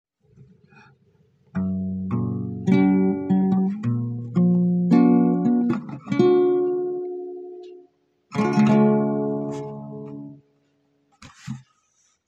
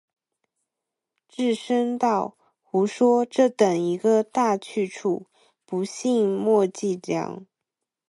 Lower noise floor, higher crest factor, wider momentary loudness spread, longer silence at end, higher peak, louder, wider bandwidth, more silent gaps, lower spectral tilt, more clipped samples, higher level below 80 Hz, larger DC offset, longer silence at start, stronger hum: second, -66 dBFS vs -85 dBFS; about the same, 16 dB vs 18 dB; first, 20 LU vs 10 LU; about the same, 0.7 s vs 0.65 s; about the same, -6 dBFS vs -6 dBFS; about the same, -21 LUFS vs -23 LUFS; second, 7.6 kHz vs 11.5 kHz; neither; first, -9 dB/octave vs -5.5 dB/octave; neither; first, -64 dBFS vs -76 dBFS; neither; first, 1.55 s vs 1.4 s; neither